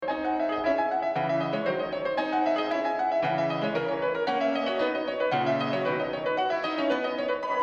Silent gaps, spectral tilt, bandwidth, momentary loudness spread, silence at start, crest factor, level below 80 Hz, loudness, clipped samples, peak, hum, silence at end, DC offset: none; -6.5 dB/octave; 7.6 kHz; 3 LU; 0 s; 14 dB; -64 dBFS; -27 LUFS; under 0.1%; -14 dBFS; none; 0 s; under 0.1%